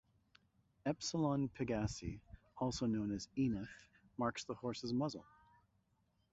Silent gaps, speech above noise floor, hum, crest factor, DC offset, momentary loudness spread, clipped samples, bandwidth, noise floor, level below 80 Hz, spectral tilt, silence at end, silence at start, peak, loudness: none; 39 dB; none; 18 dB; under 0.1%; 15 LU; under 0.1%; 8 kHz; -79 dBFS; -62 dBFS; -6 dB/octave; 1.1 s; 0.85 s; -24 dBFS; -41 LUFS